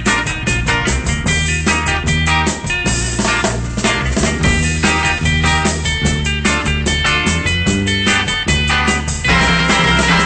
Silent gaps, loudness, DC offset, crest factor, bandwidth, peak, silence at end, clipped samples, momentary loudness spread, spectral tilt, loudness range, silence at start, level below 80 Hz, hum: none; -14 LUFS; under 0.1%; 12 dB; 9.2 kHz; -2 dBFS; 0 s; under 0.1%; 4 LU; -3.5 dB/octave; 2 LU; 0 s; -24 dBFS; none